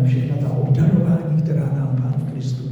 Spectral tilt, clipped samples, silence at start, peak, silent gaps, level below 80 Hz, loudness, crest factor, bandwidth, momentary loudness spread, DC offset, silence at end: -10 dB/octave; under 0.1%; 0 s; -6 dBFS; none; -48 dBFS; -19 LUFS; 12 dB; 7.4 kHz; 7 LU; under 0.1%; 0 s